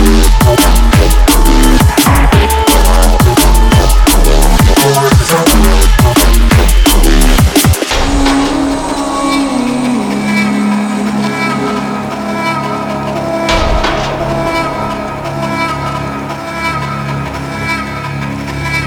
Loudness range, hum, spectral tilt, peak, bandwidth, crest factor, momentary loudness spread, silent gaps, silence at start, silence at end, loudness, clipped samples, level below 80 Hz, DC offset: 8 LU; none; -4.5 dB/octave; 0 dBFS; 18.5 kHz; 8 dB; 9 LU; none; 0 s; 0 s; -11 LUFS; under 0.1%; -12 dBFS; under 0.1%